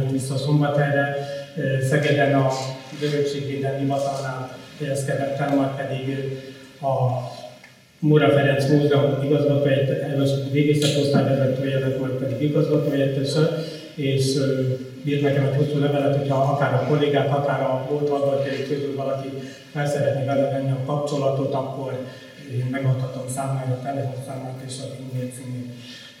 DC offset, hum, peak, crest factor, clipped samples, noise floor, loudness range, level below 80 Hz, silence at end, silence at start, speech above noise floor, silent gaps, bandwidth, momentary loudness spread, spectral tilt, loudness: under 0.1%; none; -4 dBFS; 18 dB; under 0.1%; -48 dBFS; 6 LU; -64 dBFS; 0.05 s; 0 s; 26 dB; none; 15 kHz; 13 LU; -6.5 dB/octave; -22 LUFS